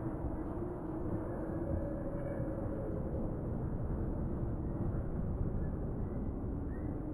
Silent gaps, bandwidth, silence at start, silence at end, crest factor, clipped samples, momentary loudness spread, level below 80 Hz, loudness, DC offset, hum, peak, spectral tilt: none; 10.5 kHz; 0 s; 0 s; 12 dB; under 0.1%; 2 LU; -42 dBFS; -39 LUFS; under 0.1%; none; -24 dBFS; -12 dB/octave